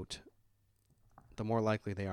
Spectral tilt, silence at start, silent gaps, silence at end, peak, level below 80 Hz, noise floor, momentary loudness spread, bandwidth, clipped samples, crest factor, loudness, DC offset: -6.5 dB/octave; 0 s; none; 0 s; -20 dBFS; -64 dBFS; -73 dBFS; 15 LU; 12 kHz; under 0.1%; 18 dB; -37 LUFS; under 0.1%